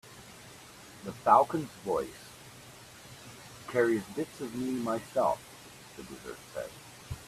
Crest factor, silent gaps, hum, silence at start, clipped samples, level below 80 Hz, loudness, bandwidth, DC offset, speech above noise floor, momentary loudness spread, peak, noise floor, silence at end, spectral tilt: 24 dB; none; none; 0.05 s; under 0.1%; -62 dBFS; -31 LUFS; 15.5 kHz; under 0.1%; 21 dB; 23 LU; -10 dBFS; -51 dBFS; 0 s; -5 dB/octave